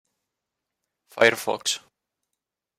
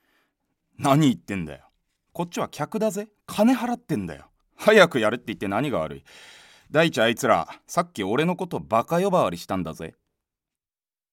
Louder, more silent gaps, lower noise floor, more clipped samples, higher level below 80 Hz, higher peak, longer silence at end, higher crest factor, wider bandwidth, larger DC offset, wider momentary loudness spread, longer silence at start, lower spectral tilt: about the same, -23 LUFS vs -23 LUFS; neither; second, -84 dBFS vs under -90 dBFS; neither; second, -72 dBFS vs -58 dBFS; about the same, -2 dBFS vs -4 dBFS; second, 1 s vs 1.25 s; about the same, 26 dB vs 22 dB; about the same, 16 kHz vs 17 kHz; neither; about the same, 13 LU vs 15 LU; first, 1.15 s vs 0.8 s; second, -1.5 dB/octave vs -5.5 dB/octave